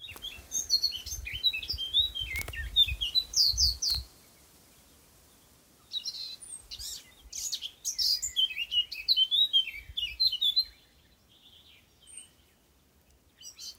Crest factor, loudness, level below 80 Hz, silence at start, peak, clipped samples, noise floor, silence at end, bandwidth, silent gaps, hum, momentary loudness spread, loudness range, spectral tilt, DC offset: 20 dB; -27 LUFS; -50 dBFS; 0 s; -14 dBFS; under 0.1%; -65 dBFS; 0.05 s; 16.5 kHz; none; none; 19 LU; 12 LU; 1 dB/octave; under 0.1%